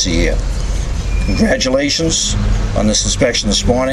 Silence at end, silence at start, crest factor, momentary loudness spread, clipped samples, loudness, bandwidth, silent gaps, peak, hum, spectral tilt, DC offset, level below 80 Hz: 0 s; 0 s; 14 dB; 8 LU; under 0.1%; -15 LUFS; 12 kHz; none; 0 dBFS; none; -4 dB/octave; under 0.1%; -18 dBFS